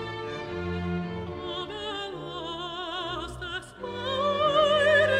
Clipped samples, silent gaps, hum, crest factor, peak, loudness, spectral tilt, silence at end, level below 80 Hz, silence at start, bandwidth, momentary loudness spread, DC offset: under 0.1%; none; none; 18 dB; -10 dBFS; -29 LUFS; -5 dB/octave; 0 s; -52 dBFS; 0 s; 10.5 kHz; 14 LU; under 0.1%